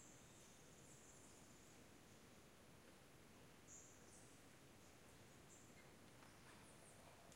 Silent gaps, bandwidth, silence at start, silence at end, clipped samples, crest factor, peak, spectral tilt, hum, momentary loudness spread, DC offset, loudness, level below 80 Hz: none; 16 kHz; 0 s; 0 s; under 0.1%; 18 dB; -46 dBFS; -3.5 dB/octave; none; 3 LU; under 0.1%; -65 LUFS; -82 dBFS